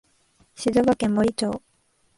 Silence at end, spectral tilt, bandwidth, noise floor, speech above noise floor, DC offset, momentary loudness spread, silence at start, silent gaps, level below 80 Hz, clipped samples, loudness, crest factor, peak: 0.6 s; -5.5 dB/octave; 11.5 kHz; -65 dBFS; 44 dB; under 0.1%; 9 LU; 0.6 s; none; -52 dBFS; under 0.1%; -23 LUFS; 16 dB; -8 dBFS